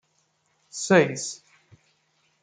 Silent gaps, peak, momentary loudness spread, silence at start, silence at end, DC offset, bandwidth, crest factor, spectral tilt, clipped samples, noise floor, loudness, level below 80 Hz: none; -4 dBFS; 20 LU; 0.75 s; 1.05 s; under 0.1%; 9.6 kHz; 24 dB; -4.5 dB/octave; under 0.1%; -70 dBFS; -23 LUFS; -72 dBFS